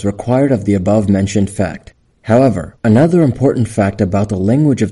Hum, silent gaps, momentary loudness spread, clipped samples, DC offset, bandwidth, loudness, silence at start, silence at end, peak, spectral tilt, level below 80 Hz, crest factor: none; none; 7 LU; under 0.1%; under 0.1%; 11.5 kHz; -13 LUFS; 0 s; 0 s; -2 dBFS; -8 dB/octave; -42 dBFS; 12 dB